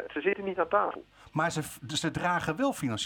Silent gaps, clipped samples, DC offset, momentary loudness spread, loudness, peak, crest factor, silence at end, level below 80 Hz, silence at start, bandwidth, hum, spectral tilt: none; under 0.1%; under 0.1%; 7 LU; -30 LUFS; -12 dBFS; 20 dB; 0 s; -60 dBFS; 0 s; 19 kHz; none; -4.5 dB/octave